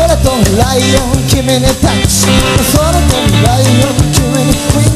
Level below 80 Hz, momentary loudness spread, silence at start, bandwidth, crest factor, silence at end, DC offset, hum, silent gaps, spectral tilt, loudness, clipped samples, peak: -18 dBFS; 2 LU; 0 s; 15 kHz; 8 dB; 0 s; under 0.1%; none; none; -4.5 dB/octave; -9 LUFS; 0.3%; 0 dBFS